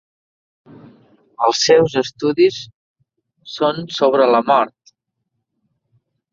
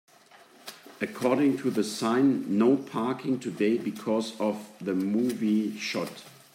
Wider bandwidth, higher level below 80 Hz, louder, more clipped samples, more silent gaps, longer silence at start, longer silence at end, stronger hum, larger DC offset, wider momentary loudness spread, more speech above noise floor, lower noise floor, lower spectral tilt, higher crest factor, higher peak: second, 7.6 kHz vs 16 kHz; first, -60 dBFS vs -80 dBFS; first, -16 LUFS vs -28 LUFS; neither; first, 2.74-2.95 s vs none; first, 1.4 s vs 0.65 s; first, 1.65 s vs 0.25 s; neither; neither; about the same, 12 LU vs 12 LU; first, 60 dB vs 29 dB; first, -75 dBFS vs -55 dBFS; second, -4 dB/octave vs -5.5 dB/octave; about the same, 18 dB vs 16 dB; first, -2 dBFS vs -12 dBFS